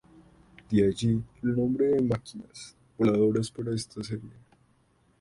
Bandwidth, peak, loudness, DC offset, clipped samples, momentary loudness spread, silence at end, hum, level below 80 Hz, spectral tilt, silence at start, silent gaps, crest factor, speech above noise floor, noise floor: 11.5 kHz; -12 dBFS; -28 LUFS; under 0.1%; under 0.1%; 19 LU; 0.9 s; none; -56 dBFS; -7 dB/octave; 0.7 s; none; 16 dB; 39 dB; -66 dBFS